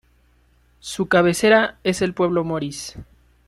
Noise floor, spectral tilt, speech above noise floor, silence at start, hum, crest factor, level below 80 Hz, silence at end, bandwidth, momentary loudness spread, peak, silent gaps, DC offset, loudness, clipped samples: -58 dBFS; -4.5 dB/octave; 39 dB; 0.85 s; none; 18 dB; -52 dBFS; 0.45 s; 14 kHz; 17 LU; -2 dBFS; none; under 0.1%; -19 LUFS; under 0.1%